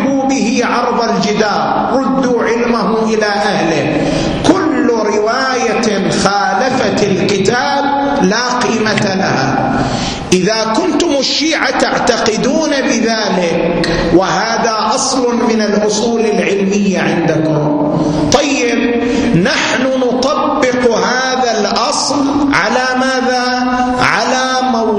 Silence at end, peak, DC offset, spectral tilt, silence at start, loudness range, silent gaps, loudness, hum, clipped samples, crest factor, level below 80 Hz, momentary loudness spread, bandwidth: 0 s; 0 dBFS; under 0.1%; -4 dB/octave; 0 s; 1 LU; none; -12 LUFS; none; under 0.1%; 12 dB; -38 dBFS; 2 LU; 10.5 kHz